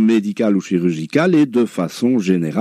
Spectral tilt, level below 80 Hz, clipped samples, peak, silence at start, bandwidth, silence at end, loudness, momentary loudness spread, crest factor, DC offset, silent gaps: -7 dB/octave; -64 dBFS; under 0.1%; -2 dBFS; 0 s; 14 kHz; 0 s; -17 LUFS; 4 LU; 14 dB; under 0.1%; none